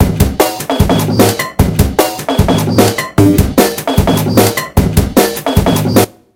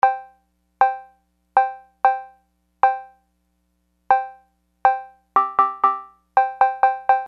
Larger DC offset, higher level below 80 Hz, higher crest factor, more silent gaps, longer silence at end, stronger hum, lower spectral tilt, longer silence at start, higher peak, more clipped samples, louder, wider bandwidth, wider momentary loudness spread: neither; first, -22 dBFS vs -66 dBFS; second, 10 dB vs 20 dB; neither; first, 0.25 s vs 0 s; second, none vs 60 Hz at -70 dBFS; about the same, -5.5 dB/octave vs -4.5 dB/octave; about the same, 0 s vs 0.05 s; about the same, 0 dBFS vs -2 dBFS; first, 0.9% vs under 0.1%; first, -11 LUFS vs -21 LUFS; first, over 20 kHz vs 5.8 kHz; second, 4 LU vs 12 LU